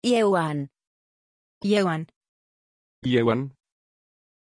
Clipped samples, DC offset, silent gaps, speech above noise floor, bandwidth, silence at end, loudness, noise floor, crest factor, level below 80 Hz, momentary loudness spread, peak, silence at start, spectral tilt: under 0.1%; under 0.1%; 0.87-1.61 s, 2.16-2.21 s, 2.28-3.02 s; over 68 dB; 10.5 kHz; 0.9 s; -24 LUFS; under -90 dBFS; 18 dB; -64 dBFS; 15 LU; -10 dBFS; 0.05 s; -6 dB/octave